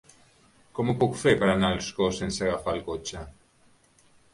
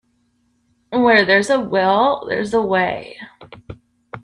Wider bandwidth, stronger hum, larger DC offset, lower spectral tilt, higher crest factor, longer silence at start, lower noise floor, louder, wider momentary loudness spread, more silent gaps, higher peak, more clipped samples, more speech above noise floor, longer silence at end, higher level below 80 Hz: about the same, 11.5 kHz vs 11.5 kHz; neither; neither; about the same, -5 dB/octave vs -5 dB/octave; about the same, 20 dB vs 18 dB; second, 0.75 s vs 0.9 s; about the same, -61 dBFS vs -63 dBFS; second, -26 LUFS vs -16 LUFS; second, 16 LU vs 25 LU; neither; second, -8 dBFS vs 0 dBFS; neither; second, 35 dB vs 47 dB; first, 1.05 s vs 0.05 s; about the same, -50 dBFS vs -54 dBFS